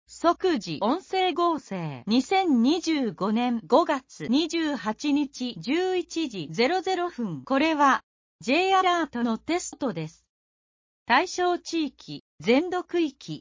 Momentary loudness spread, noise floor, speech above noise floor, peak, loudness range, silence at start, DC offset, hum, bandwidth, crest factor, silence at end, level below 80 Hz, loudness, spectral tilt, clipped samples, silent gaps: 9 LU; under -90 dBFS; over 65 dB; -6 dBFS; 3 LU; 0.1 s; under 0.1%; none; 7.6 kHz; 20 dB; 0 s; -64 dBFS; -25 LUFS; -4.5 dB/octave; under 0.1%; 8.03-8.39 s, 10.29-11.06 s, 12.20-12.38 s